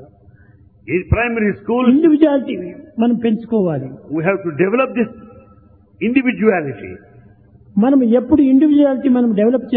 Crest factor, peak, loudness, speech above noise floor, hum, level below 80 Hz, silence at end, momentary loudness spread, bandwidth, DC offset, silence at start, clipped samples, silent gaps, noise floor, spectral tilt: 16 dB; 0 dBFS; -15 LUFS; 33 dB; none; -42 dBFS; 0 s; 12 LU; 3.9 kHz; under 0.1%; 0 s; under 0.1%; none; -47 dBFS; -11.5 dB/octave